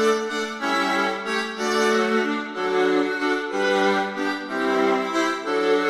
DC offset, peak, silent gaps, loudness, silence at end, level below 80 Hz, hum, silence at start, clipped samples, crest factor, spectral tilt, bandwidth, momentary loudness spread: under 0.1%; -8 dBFS; none; -22 LUFS; 0 s; -72 dBFS; none; 0 s; under 0.1%; 14 dB; -3.5 dB/octave; 14.5 kHz; 5 LU